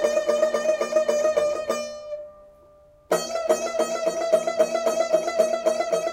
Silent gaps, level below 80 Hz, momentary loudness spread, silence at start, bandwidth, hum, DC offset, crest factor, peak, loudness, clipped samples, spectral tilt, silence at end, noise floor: none; -64 dBFS; 8 LU; 0 s; 16 kHz; none; under 0.1%; 18 dB; -6 dBFS; -23 LUFS; under 0.1%; -2.5 dB/octave; 0 s; -53 dBFS